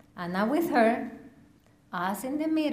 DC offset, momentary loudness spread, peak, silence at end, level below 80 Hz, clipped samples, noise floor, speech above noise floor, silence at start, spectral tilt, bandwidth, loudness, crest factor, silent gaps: under 0.1%; 15 LU; -12 dBFS; 0 s; -66 dBFS; under 0.1%; -59 dBFS; 33 dB; 0.15 s; -5.5 dB/octave; 15.5 kHz; -28 LUFS; 18 dB; none